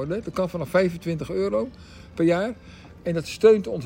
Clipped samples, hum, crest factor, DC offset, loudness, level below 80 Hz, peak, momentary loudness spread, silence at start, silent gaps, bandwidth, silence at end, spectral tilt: under 0.1%; none; 20 dB; under 0.1%; -24 LUFS; -52 dBFS; -4 dBFS; 15 LU; 0 s; none; 16.5 kHz; 0 s; -6.5 dB/octave